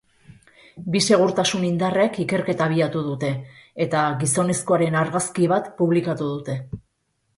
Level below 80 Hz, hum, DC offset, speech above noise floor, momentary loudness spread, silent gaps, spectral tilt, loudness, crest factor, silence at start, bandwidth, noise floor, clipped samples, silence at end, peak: -58 dBFS; none; under 0.1%; 50 dB; 12 LU; none; -5 dB/octave; -21 LUFS; 18 dB; 0.75 s; 11.5 kHz; -71 dBFS; under 0.1%; 0.6 s; -4 dBFS